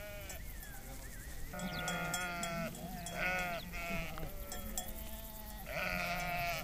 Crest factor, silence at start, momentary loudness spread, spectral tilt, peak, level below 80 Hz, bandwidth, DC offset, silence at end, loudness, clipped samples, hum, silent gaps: 20 dB; 0 s; 12 LU; -3.5 dB/octave; -22 dBFS; -48 dBFS; 16 kHz; under 0.1%; 0 s; -41 LUFS; under 0.1%; none; none